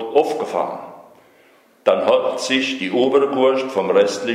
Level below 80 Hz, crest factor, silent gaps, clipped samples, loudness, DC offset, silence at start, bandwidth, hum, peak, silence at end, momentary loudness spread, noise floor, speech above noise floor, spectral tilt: -70 dBFS; 18 dB; none; under 0.1%; -18 LUFS; under 0.1%; 0 s; 13 kHz; none; -2 dBFS; 0 s; 8 LU; -53 dBFS; 35 dB; -4 dB/octave